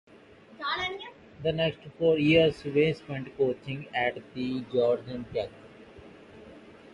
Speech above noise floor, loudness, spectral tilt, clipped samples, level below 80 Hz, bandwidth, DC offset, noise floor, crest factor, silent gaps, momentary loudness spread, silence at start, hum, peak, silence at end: 26 dB; -28 LUFS; -7 dB/octave; under 0.1%; -58 dBFS; 9.4 kHz; under 0.1%; -53 dBFS; 20 dB; none; 14 LU; 0.5 s; none; -10 dBFS; 0.25 s